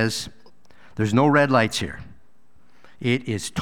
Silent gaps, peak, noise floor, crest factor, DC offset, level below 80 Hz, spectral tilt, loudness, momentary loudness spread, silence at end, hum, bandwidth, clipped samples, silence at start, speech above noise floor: none; -4 dBFS; -62 dBFS; 20 dB; 0.7%; -52 dBFS; -5 dB/octave; -22 LUFS; 19 LU; 0 s; none; 17.5 kHz; under 0.1%; 0 s; 41 dB